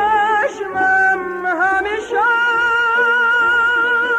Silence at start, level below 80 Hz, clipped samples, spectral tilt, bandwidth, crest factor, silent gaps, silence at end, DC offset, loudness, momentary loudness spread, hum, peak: 0 s; -52 dBFS; under 0.1%; -3 dB/octave; 10.5 kHz; 10 dB; none; 0 s; under 0.1%; -15 LUFS; 6 LU; none; -6 dBFS